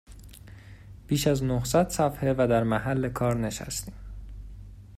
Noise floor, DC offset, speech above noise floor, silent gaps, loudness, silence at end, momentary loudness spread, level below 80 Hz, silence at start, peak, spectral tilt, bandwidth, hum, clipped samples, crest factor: -47 dBFS; under 0.1%; 21 dB; none; -26 LUFS; 0 s; 23 LU; -44 dBFS; 0.1 s; -10 dBFS; -5.5 dB/octave; 16 kHz; none; under 0.1%; 18 dB